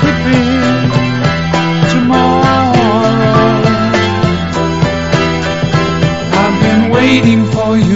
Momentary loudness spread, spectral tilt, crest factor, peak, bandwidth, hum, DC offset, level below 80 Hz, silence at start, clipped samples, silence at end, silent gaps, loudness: 4 LU; -6.5 dB/octave; 10 dB; 0 dBFS; 8 kHz; none; 2%; -32 dBFS; 0 s; 0.1%; 0 s; none; -11 LUFS